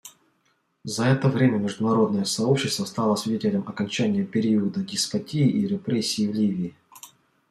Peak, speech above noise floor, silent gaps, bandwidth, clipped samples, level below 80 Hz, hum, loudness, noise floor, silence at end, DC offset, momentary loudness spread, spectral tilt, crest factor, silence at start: -8 dBFS; 46 dB; none; 13.5 kHz; under 0.1%; -66 dBFS; none; -24 LUFS; -69 dBFS; 0.45 s; under 0.1%; 5 LU; -5.5 dB/octave; 16 dB; 0.05 s